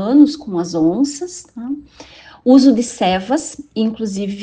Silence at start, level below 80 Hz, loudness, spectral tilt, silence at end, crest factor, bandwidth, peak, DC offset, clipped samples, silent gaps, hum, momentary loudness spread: 0 s; -52 dBFS; -16 LUFS; -5.5 dB/octave; 0 s; 16 dB; 9.4 kHz; 0 dBFS; under 0.1%; under 0.1%; none; none; 17 LU